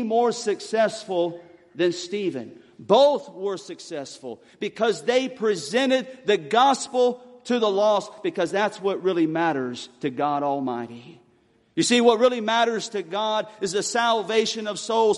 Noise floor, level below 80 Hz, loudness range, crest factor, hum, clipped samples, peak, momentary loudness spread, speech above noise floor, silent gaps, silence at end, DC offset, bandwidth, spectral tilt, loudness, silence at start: -61 dBFS; -72 dBFS; 3 LU; 20 dB; none; under 0.1%; -4 dBFS; 15 LU; 38 dB; none; 0 s; under 0.1%; 11.5 kHz; -3.5 dB/octave; -23 LUFS; 0 s